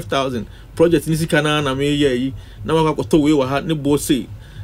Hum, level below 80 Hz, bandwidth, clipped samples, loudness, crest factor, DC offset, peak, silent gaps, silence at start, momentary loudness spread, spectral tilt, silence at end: none; -38 dBFS; 16 kHz; under 0.1%; -18 LUFS; 16 dB; under 0.1%; -2 dBFS; none; 0 s; 10 LU; -5.5 dB/octave; 0 s